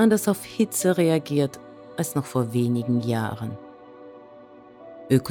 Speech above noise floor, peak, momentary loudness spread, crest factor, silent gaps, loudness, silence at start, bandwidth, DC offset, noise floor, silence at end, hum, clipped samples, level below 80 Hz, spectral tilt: 24 dB; -8 dBFS; 24 LU; 18 dB; none; -24 LUFS; 0 s; over 20 kHz; under 0.1%; -47 dBFS; 0 s; none; under 0.1%; -62 dBFS; -6 dB/octave